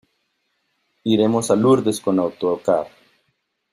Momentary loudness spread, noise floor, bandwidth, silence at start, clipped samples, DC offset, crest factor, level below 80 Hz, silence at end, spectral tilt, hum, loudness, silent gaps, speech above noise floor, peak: 7 LU; -71 dBFS; 15 kHz; 1.05 s; under 0.1%; under 0.1%; 18 dB; -60 dBFS; 0.85 s; -6 dB/octave; none; -19 LUFS; none; 53 dB; -4 dBFS